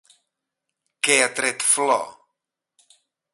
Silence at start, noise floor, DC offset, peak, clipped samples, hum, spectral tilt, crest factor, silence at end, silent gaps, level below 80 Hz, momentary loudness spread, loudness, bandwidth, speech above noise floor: 1.05 s; -82 dBFS; under 0.1%; -2 dBFS; under 0.1%; none; 0 dB/octave; 22 dB; 1.25 s; none; -72 dBFS; 7 LU; -19 LUFS; 12 kHz; 62 dB